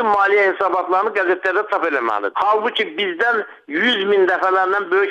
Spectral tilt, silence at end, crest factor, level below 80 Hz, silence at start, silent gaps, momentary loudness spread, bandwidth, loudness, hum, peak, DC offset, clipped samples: -4.5 dB/octave; 0 s; 12 dB; -66 dBFS; 0 s; none; 5 LU; 8 kHz; -17 LUFS; none; -6 dBFS; under 0.1%; under 0.1%